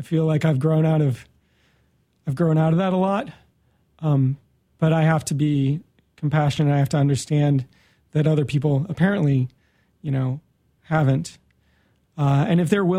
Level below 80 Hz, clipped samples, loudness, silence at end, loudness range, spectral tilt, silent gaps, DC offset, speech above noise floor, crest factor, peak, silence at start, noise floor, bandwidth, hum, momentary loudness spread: -56 dBFS; under 0.1%; -21 LUFS; 0 s; 3 LU; -7.5 dB/octave; none; under 0.1%; 44 dB; 18 dB; -4 dBFS; 0 s; -64 dBFS; 12.5 kHz; none; 11 LU